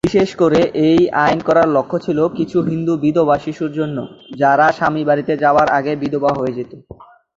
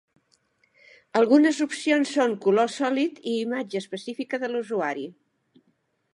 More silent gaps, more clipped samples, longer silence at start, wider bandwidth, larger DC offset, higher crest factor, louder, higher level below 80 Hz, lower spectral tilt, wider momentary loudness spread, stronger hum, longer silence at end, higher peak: neither; neither; second, 0.05 s vs 1.15 s; second, 7.8 kHz vs 11.5 kHz; neither; about the same, 14 dB vs 18 dB; first, -16 LUFS vs -24 LUFS; first, -48 dBFS vs -80 dBFS; first, -7 dB/octave vs -4.5 dB/octave; second, 9 LU vs 13 LU; neither; second, 0.35 s vs 1 s; first, -2 dBFS vs -8 dBFS